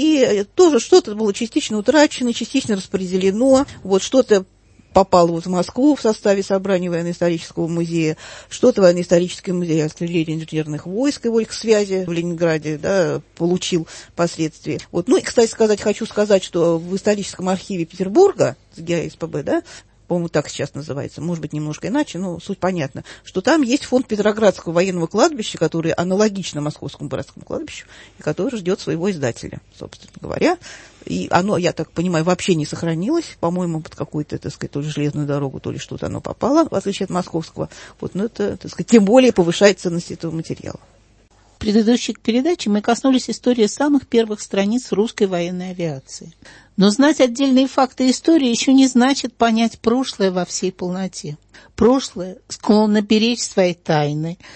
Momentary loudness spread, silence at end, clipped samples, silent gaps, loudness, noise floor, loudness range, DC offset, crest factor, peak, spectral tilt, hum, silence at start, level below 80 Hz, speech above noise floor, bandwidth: 13 LU; 0 s; under 0.1%; none; -18 LUFS; -52 dBFS; 7 LU; under 0.1%; 18 dB; 0 dBFS; -5.5 dB/octave; none; 0 s; -50 dBFS; 34 dB; 8.8 kHz